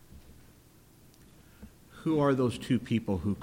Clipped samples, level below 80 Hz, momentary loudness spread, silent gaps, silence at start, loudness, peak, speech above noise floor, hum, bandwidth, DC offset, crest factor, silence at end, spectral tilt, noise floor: under 0.1%; -56 dBFS; 9 LU; none; 0.15 s; -30 LUFS; -14 dBFS; 30 dB; none; 16.5 kHz; under 0.1%; 18 dB; 0 s; -7.5 dB/octave; -58 dBFS